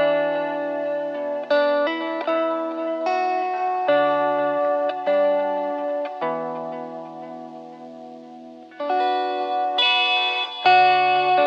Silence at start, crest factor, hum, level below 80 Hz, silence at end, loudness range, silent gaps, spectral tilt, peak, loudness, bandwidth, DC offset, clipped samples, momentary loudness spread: 0 s; 16 dB; none; -78 dBFS; 0 s; 9 LU; none; -4.5 dB/octave; -6 dBFS; -21 LUFS; 7.2 kHz; under 0.1%; under 0.1%; 20 LU